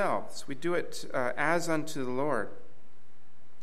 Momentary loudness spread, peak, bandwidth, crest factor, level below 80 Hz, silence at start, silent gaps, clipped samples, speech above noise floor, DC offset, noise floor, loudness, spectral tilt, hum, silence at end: 8 LU; -14 dBFS; 15.5 kHz; 20 dB; -70 dBFS; 0 s; none; under 0.1%; 32 dB; 3%; -64 dBFS; -32 LUFS; -4.5 dB/octave; none; 1 s